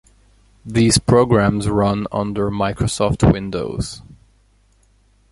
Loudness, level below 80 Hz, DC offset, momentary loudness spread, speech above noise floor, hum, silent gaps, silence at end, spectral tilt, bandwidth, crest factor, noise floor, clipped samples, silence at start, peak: -18 LUFS; -34 dBFS; under 0.1%; 11 LU; 39 dB; 50 Hz at -35 dBFS; none; 1.2 s; -5.5 dB/octave; 11.5 kHz; 18 dB; -56 dBFS; under 0.1%; 0.65 s; -2 dBFS